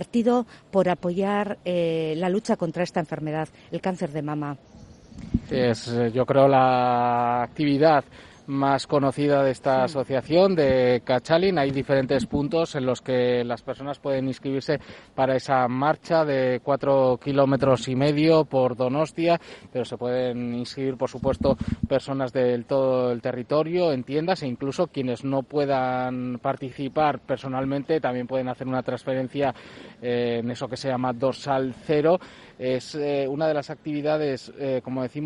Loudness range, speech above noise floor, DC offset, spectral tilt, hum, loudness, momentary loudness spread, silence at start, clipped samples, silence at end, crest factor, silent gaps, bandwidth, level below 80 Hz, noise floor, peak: 6 LU; 20 dB; under 0.1%; -7 dB/octave; none; -24 LUFS; 9 LU; 0 s; under 0.1%; 0 s; 18 dB; none; 11 kHz; -52 dBFS; -43 dBFS; -4 dBFS